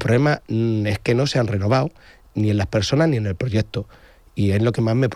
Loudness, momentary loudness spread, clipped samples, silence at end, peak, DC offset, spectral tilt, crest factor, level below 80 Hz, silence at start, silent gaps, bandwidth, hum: -21 LUFS; 10 LU; under 0.1%; 0 s; -6 dBFS; under 0.1%; -6.5 dB/octave; 14 dB; -46 dBFS; 0 s; none; 11.5 kHz; none